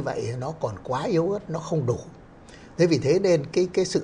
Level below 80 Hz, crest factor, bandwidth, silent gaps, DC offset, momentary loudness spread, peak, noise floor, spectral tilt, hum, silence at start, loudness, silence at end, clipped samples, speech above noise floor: -54 dBFS; 16 dB; 10.5 kHz; none; under 0.1%; 10 LU; -8 dBFS; -46 dBFS; -6 dB/octave; none; 0 s; -25 LUFS; 0 s; under 0.1%; 23 dB